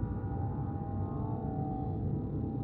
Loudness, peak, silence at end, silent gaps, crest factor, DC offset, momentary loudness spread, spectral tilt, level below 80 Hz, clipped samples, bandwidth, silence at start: -36 LUFS; -22 dBFS; 0 s; none; 12 dB; under 0.1%; 2 LU; -13.5 dB/octave; -46 dBFS; under 0.1%; 2.6 kHz; 0 s